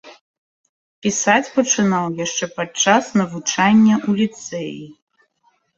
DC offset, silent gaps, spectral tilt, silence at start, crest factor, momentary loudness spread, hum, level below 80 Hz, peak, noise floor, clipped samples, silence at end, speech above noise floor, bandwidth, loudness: under 0.1%; 0.21-1.02 s; -3.5 dB/octave; 0.05 s; 18 dB; 14 LU; none; -60 dBFS; -2 dBFS; -63 dBFS; under 0.1%; 0.85 s; 45 dB; 7.8 kHz; -17 LUFS